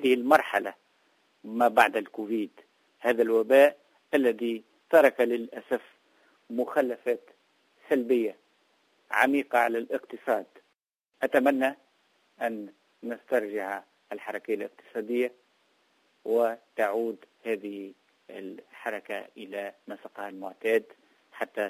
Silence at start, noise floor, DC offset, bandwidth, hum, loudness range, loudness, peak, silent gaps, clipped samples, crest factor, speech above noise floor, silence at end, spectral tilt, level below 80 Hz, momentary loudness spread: 0 s; -76 dBFS; under 0.1%; 16 kHz; none; 10 LU; -27 LUFS; -6 dBFS; none; under 0.1%; 22 dB; 49 dB; 0 s; -4.5 dB/octave; -80 dBFS; 18 LU